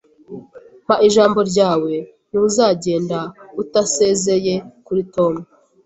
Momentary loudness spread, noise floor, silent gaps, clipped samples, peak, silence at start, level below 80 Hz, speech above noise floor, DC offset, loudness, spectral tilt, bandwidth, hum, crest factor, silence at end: 15 LU; -42 dBFS; none; under 0.1%; -2 dBFS; 0.3 s; -56 dBFS; 26 dB; under 0.1%; -17 LUFS; -4.5 dB/octave; 8.2 kHz; none; 16 dB; 0.4 s